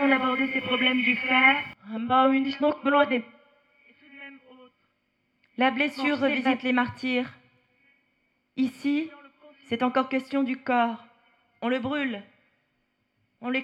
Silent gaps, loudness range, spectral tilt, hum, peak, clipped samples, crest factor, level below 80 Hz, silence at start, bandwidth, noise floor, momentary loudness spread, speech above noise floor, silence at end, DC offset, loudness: none; 8 LU; -5.5 dB/octave; none; -6 dBFS; under 0.1%; 20 dB; -74 dBFS; 0 s; 8.4 kHz; -74 dBFS; 17 LU; 49 dB; 0 s; under 0.1%; -25 LUFS